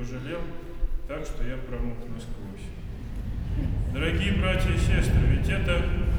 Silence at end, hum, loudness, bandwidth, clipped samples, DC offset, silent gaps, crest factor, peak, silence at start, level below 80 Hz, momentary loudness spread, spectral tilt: 0 s; none; -28 LUFS; 14.5 kHz; under 0.1%; under 0.1%; none; 16 dB; -10 dBFS; 0 s; -28 dBFS; 16 LU; -6.5 dB/octave